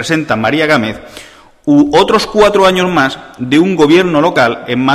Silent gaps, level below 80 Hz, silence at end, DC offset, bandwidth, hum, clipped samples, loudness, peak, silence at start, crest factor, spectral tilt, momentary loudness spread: none; -42 dBFS; 0 s; under 0.1%; 14.5 kHz; none; under 0.1%; -10 LUFS; 0 dBFS; 0 s; 10 dB; -5.5 dB/octave; 7 LU